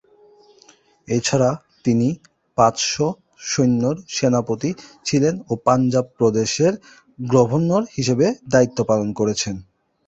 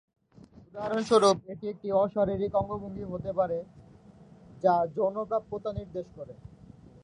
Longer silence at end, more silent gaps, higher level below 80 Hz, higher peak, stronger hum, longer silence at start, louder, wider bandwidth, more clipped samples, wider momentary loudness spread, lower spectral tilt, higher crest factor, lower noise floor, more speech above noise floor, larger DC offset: about the same, 0.45 s vs 0.55 s; neither; about the same, -54 dBFS vs -56 dBFS; first, -2 dBFS vs -10 dBFS; neither; first, 1.1 s vs 0.75 s; first, -20 LUFS vs -29 LUFS; second, 8.2 kHz vs 10.5 kHz; neither; second, 9 LU vs 18 LU; about the same, -5.5 dB/octave vs -5.5 dB/octave; about the same, 18 dB vs 20 dB; about the same, -53 dBFS vs -54 dBFS; first, 34 dB vs 26 dB; neither